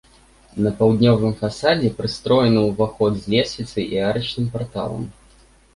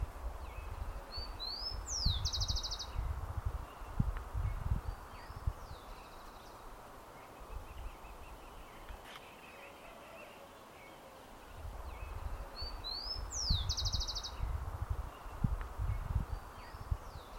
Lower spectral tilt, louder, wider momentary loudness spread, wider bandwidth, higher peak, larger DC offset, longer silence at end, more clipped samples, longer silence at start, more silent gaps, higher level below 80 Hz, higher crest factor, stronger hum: first, -6.5 dB/octave vs -3.5 dB/octave; first, -20 LUFS vs -41 LUFS; second, 11 LU vs 17 LU; second, 11.5 kHz vs 16.5 kHz; first, -2 dBFS vs -18 dBFS; neither; first, 0.65 s vs 0 s; neither; first, 0.55 s vs 0 s; neither; about the same, -46 dBFS vs -44 dBFS; second, 18 dB vs 24 dB; neither